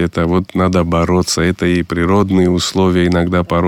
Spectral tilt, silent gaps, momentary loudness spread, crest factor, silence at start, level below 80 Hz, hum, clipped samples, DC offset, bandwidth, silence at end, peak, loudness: -6 dB/octave; none; 3 LU; 10 dB; 0 s; -34 dBFS; none; under 0.1%; under 0.1%; 15.5 kHz; 0 s; -2 dBFS; -14 LUFS